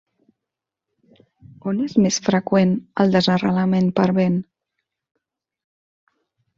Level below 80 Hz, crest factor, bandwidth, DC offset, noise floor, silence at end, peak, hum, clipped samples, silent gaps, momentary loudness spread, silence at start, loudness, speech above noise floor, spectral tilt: -58 dBFS; 20 dB; 7.6 kHz; under 0.1%; -85 dBFS; 2.15 s; -2 dBFS; none; under 0.1%; none; 7 LU; 1.65 s; -19 LUFS; 67 dB; -6 dB/octave